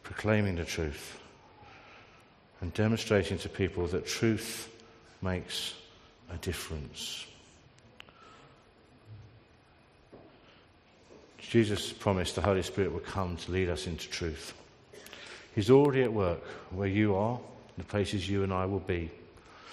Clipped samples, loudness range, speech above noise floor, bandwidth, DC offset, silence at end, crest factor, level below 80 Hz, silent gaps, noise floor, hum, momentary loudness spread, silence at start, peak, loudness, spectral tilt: under 0.1%; 12 LU; 30 dB; 13.5 kHz; under 0.1%; 0 s; 24 dB; -56 dBFS; none; -61 dBFS; none; 20 LU; 0.05 s; -10 dBFS; -32 LUFS; -5.5 dB/octave